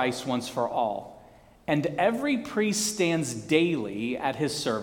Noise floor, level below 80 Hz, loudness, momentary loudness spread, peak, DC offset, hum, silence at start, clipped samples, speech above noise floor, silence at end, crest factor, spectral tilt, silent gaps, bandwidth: -53 dBFS; -62 dBFS; -27 LUFS; 6 LU; -6 dBFS; under 0.1%; none; 0 s; under 0.1%; 27 dB; 0 s; 20 dB; -4 dB/octave; none; 19 kHz